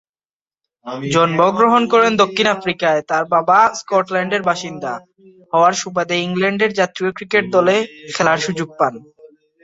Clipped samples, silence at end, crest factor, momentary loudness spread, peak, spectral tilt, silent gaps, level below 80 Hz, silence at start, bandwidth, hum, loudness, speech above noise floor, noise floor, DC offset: under 0.1%; 0.4 s; 16 dB; 10 LU; -2 dBFS; -4.5 dB/octave; none; -60 dBFS; 0.85 s; 8 kHz; none; -16 LUFS; over 74 dB; under -90 dBFS; under 0.1%